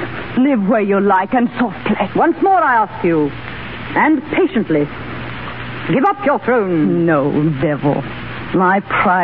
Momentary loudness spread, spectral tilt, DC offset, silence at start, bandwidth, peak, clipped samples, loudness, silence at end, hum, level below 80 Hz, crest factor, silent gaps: 13 LU; -10.5 dB/octave; 0.9%; 0 s; 5.2 kHz; -2 dBFS; under 0.1%; -15 LUFS; 0 s; none; -44 dBFS; 12 dB; none